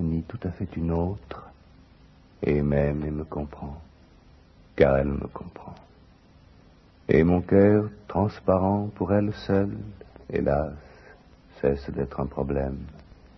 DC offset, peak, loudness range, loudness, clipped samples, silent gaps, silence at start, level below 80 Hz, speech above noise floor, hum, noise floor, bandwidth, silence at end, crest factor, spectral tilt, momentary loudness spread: under 0.1%; -4 dBFS; 6 LU; -25 LUFS; under 0.1%; none; 0 s; -42 dBFS; 29 dB; none; -54 dBFS; 6.2 kHz; 0.35 s; 22 dB; -10 dB/octave; 21 LU